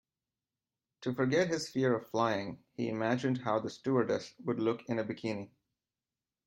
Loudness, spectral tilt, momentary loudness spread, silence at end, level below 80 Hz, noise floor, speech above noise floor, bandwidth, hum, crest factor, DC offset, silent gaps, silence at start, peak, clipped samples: -33 LUFS; -6 dB/octave; 8 LU; 1 s; -76 dBFS; under -90 dBFS; over 57 dB; 16 kHz; none; 20 dB; under 0.1%; none; 1 s; -16 dBFS; under 0.1%